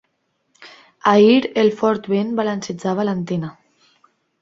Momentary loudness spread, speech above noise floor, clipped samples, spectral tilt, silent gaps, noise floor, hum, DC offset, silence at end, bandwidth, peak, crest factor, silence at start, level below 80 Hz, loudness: 12 LU; 52 dB; under 0.1%; -6.5 dB/octave; none; -69 dBFS; none; under 0.1%; 0.9 s; 7.8 kHz; -2 dBFS; 18 dB; 0.6 s; -62 dBFS; -18 LUFS